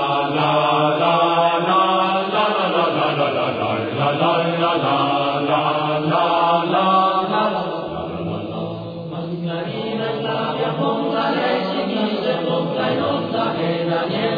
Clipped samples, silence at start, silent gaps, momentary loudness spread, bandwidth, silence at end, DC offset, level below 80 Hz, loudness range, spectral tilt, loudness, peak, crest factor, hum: under 0.1%; 0 s; none; 9 LU; 5 kHz; 0 s; under 0.1%; -58 dBFS; 6 LU; -8 dB/octave; -19 LUFS; -4 dBFS; 14 dB; none